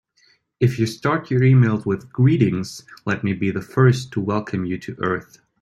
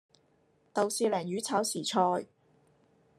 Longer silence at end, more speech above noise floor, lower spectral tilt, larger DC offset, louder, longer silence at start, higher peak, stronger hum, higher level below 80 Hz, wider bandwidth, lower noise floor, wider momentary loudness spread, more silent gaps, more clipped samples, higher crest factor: second, 0.4 s vs 0.95 s; about the same, 41 dB vs 39 dB; first, -7.5 dB/octave vs -3.5 dB/octave; neither; first, -20 LUFS vs -31 LUFS; second, 0.6 s vs 0.75 s; first, -2 dBFS vs -12 dBFS; neither; first, -54 dBFS vs -82 dBFS; second, 11.5 kHz vs 13 kHz; second, -60 dBFS vs -69 dBFS; about the same, 10 LU vs 8 LU; neither; neither; about the same, 18 dB vs 20 dB